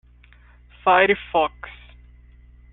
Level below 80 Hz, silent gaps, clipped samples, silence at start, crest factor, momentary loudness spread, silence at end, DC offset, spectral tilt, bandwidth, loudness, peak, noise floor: -48 dBFS; none; under 0.1%; 0.85 s; 20 dB; 22 LU; 1 s; under 0.1%; -7.5 dB/octave; 4.1 kHz; -19 LUFS; -4 dBFS; -50 dBFS